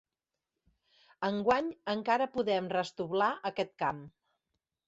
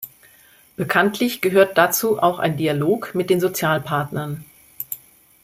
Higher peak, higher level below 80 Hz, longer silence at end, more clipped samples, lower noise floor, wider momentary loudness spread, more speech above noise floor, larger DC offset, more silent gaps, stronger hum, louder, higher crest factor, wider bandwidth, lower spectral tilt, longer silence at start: second, -14 dBFS vs -2 dBFS; second, -70 dBFS vs -60 dBFS; first, 0.8 s vs 0.5 s; neither; first, -90 dBFS vs -52 dBFS; second, 6 LU vs 16 LU; first, 58 dB vs 32 dB; neither; neither; neither; second, -32 LUFS vs -20 LUFS; about the same, 20 dB vs 18 dB; second, 8 kHz vs 16.5 kHz; about the same, -5.5 dB/octave vs -4.5 dB/octave; first, 1.2 s vs 0 s